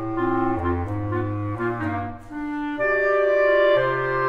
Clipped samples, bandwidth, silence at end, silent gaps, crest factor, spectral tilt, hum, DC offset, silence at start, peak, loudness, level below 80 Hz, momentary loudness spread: under 0.1%; 6.8 kHz; 0 s; none; 14 dB; -8.5 dB/octave; none; under 0.1%; 0 s; -8 dBFS; -22 LUFS; -44 dBFS; 11 LU